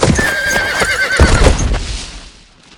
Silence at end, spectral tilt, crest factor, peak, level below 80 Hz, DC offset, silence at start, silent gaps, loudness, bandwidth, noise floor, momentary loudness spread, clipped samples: 0.5 s; -4 dB/octave; 14 dB; 0 dBFS; -18 dBFS; under 0.1%; 0 s; none; -13 LUFS; 18.5 kHz; -41 dBFS; 14 LU; 0.3%